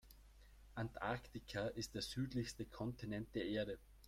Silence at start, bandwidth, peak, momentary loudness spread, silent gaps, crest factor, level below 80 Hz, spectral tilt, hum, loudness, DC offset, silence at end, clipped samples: 0.05 s; 16 kHz; -28 dBFS; 6 LU; none; 18 dB; -62 dBFS; -5.5 dB/octave; none; -46 LUFS; under 0.1%; 0 s; under 0.1%